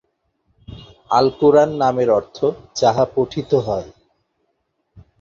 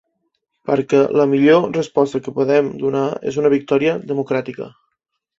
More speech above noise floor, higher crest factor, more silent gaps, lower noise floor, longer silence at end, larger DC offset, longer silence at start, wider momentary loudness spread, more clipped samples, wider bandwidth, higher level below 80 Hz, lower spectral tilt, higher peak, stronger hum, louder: about the same, 54 dB vs 55 dB; about the same, 18 dB vs 16 dB; neither; about the same, -70 dBFS vs -71 dBFS; second, 0.2 s vs 0.7 s; neither; about the same, 0.7 s vs 0.65 s; about the same, 9 LU vs 9 LU; neither; about the same, 7.6 kHz vs 7.8 kHz; first, -50 dBFS vs -60 dBFS; about the same, -6 dB/octave vs -7 dB/octave; about the same, -2 dBFS vs -2 dBFS; neither; about the same, -17 LUFS vs -17 LUFS